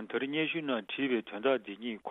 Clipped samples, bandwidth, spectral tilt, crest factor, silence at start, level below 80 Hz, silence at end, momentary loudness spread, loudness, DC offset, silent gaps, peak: under 0.1%; 4 kHz; -7.5 dB/octave; 18 dB; 0 s; -78 dBFS; 0 s; 5 LU; -33 LUFS; under 0.1%; none; -16 dBFS